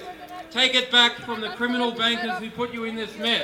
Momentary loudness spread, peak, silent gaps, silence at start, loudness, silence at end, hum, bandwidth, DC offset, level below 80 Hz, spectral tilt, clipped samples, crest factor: 13 LU; -2 dBFS; none; 0 s; -22 LUFS; 0 s; none; 16 kHz; under 0.1%; -62 dBFS; -2 dB/octave; under 0.1%; 22 dB